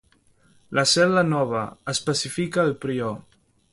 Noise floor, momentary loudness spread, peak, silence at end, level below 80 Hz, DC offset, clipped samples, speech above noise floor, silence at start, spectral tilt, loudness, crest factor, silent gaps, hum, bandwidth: -60 dBFS; 10 LU; -6 dBFS; 0.55 s; -60 dBFS; under 0.1%; under 0.1%; 37 dB; 0.7 s; -4 dB/octave; -23 LUFS; 18 dB; none; none; 11.5 kHz